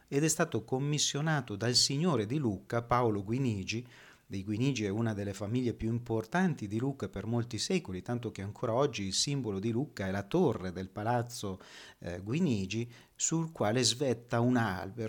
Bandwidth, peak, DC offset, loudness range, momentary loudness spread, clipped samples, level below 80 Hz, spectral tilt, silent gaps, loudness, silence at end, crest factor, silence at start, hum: 19 kHz; -14 dBFS; under 0.1%; 4 LU; 10 LU; under 0.1%; -62 dBFS; -4.5 dB/octave; none; -32 LUFS; 0 s; 20 dB; 0.1 s; none